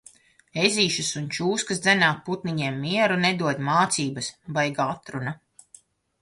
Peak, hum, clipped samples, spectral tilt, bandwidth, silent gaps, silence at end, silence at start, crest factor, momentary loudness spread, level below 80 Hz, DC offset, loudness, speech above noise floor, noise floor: -4 dBFS; none; under 0.1%; -3.5 dB/octave; 11.5 kHz; none; 0.85 s; 0.55 s; 22 dB; 12 LU; -64 dBFS; under 0.1%; -24 LUFS; 31 dB; -55 dBFS